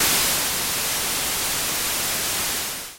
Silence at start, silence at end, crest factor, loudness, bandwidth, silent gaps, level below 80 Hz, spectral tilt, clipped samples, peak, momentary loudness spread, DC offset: 0 s; 0 s; 16 dB; -21 LUFS; 17 kHz; none; -46 dBFS; 0 dB/octave; under 0.1%; -8 dBFS; 4 LU; under 0.1%